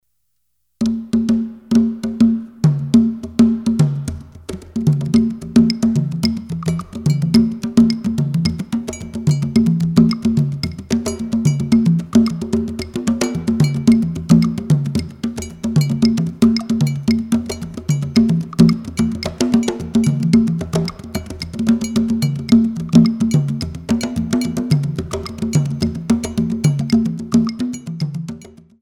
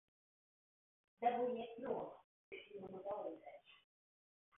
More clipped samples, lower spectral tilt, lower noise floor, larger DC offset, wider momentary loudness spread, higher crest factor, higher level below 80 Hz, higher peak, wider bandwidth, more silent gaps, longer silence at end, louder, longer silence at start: neither; first, -7 dB/octave vs -1 dB/octave; second, -72 dBFS vs under -90 dBFS; neither; second, 10 LU vs 18 LU; second, 16 dB vs 22 dB; first, -40 dBFS vs -88 dBFS; first, 0 dBFS vs -26 dBFS; first, 13.5 kHz vs 3.8 kHz; second, none vs 2.24-2.52 s; second, 0.35 s vs 0.8 s; first, -17 LUFS vs -45 LUFS; second, 0.8 s vs 1.2 s